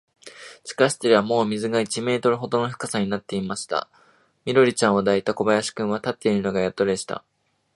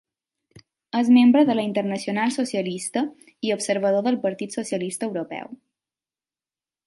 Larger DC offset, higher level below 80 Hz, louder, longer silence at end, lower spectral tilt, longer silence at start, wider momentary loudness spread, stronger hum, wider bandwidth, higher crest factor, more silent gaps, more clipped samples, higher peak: neither; first, -60 dBFS vs -74 dBFS; about the same, -22 LUFS vs -22 LUFS; second, 0.55 s vs 1.3 s; about the same, -4.5 dB/octave vs -5 dB/octave; second, 0.25 s vs 0.95 s; second, 11 LU vs 14 LU; neither; about the same, 11.5 kHz vs 11.5 kHz; about the same, 22 dB vs 18 dB; neither; neither; first, -2 dBFS vs -6 dBFS